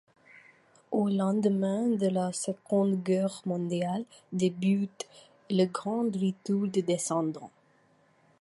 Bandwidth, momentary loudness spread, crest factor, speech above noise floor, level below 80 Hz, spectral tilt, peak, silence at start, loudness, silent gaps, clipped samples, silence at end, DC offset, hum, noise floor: 11.5 kHz; 8 LU; 16 dB; 36 dB; -76 dBFS; -6.5 dB/octave; -14 dBFS; 0.9 s; -29 LUFS; none; under 0.1%; 0.95 s; under 0.1%; none; -65 dBFS